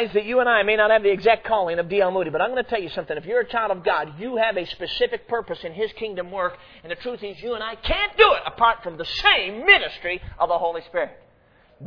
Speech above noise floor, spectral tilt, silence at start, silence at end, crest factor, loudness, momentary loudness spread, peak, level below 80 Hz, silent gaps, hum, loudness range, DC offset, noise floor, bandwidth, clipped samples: 34 dB; -5 dB/octave; 0 s; 0 s; 22 dB; -21 LUFS; 13 LU; 0 dBFS; -44 dBFS; none; none; 8 LU; under 0.1%; -56 dBFS; 5.4 kHz; under 0.1%